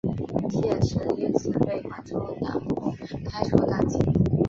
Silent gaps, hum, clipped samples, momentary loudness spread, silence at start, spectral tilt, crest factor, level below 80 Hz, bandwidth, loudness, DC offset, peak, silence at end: none; none; under 0.1%; 10 LU; 0.05 s; -8 dB/octave; 22 dB; -42 dBFS; 7.6 kHz; -26 LUFS; under 0.1%; -2 dBFS; 0 s